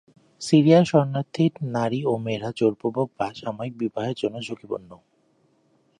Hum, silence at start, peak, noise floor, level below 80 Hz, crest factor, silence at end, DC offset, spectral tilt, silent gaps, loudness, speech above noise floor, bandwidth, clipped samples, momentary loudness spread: none; 0.4 s; -4 dBFS; -64 dBFS; -66 dBFS; 20 dB; 1.05 s; under 0.1%; -7 dB/octave; none; -23 LUFS; 42 dB; 11 kHz; under 0.1%; 16 LU